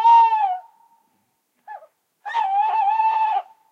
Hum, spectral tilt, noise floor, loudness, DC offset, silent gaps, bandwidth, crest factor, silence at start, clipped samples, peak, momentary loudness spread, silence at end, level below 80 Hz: none; 1 dB/octave; -69 dBFS; -19 LUFS; under 0.1%; none; 6.4 kHz; 14 dB; 0 s; under 0.1%; -6 dBFS; 26 LU; 0.3 s; under -90 dBFS